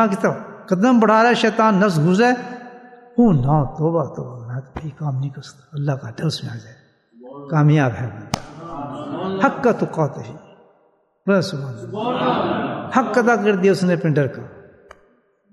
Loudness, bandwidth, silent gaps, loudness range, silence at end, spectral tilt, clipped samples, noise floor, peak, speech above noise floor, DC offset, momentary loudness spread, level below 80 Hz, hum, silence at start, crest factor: -19 LUFS; 12 kHz; none; 7 LU; 0.9 s; -7 dB/octave; under 0.1%; -60 dBFS; 0 dBFS; 42 dB; under 0.1%; 18 LU; -48 dBFS; none; 0 s; 20 dB